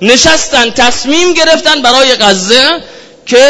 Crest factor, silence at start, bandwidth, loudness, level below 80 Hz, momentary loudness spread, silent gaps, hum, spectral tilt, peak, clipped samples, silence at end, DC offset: 8 dB; 0 s; 11 kHz; -6 LUFS; -36 dBFS; 4 LU; none; none; -1.5 dB/octave; 0 dBFS; 3%; 0 s; under 0.1%